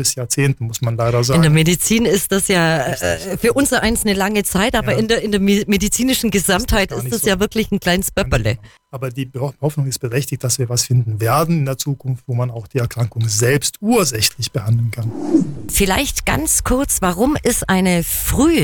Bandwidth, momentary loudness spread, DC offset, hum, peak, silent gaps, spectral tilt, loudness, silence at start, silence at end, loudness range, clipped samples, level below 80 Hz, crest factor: 19 kHz; 8 LU; under 0.1%; none; 0 dBFS; none; -4.5 dB/octave; -17 LUFS; 0 s; 0 s; 4 LU; under 0.1%; -32 dBFS; 16 dB